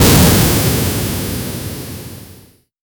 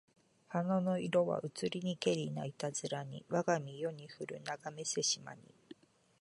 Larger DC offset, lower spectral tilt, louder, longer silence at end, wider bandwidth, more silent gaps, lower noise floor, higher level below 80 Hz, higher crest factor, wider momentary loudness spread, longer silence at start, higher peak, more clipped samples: neither; about the same, -4.5 dB/octave vs -4.5 dB/octave; first, -14 LUFS vs -37 LUFS; first, 0.65 s vs 0.45 s; first, over 20 kHz vs 11.5 kHz; neither; second, -44 dBFS vs -60 dBFS; first, -26 dBFS vs -80 dBFS; about the same, 16 dB vs 20 dB; first, 21 LU vs 10 LU; second, 0 s vs 0.5 s; first, 0 dBFS vs -18 dBFS; neither